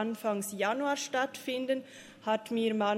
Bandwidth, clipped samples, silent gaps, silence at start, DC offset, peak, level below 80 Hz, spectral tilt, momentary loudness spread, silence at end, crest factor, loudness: 16 kHz; under 0.1%; none; 0 s; under 0.1%; -16 dBFS; -82 dBFS; -3.5 dB/octave; 5 LU; 0 s; 16 dB; -33 LUFS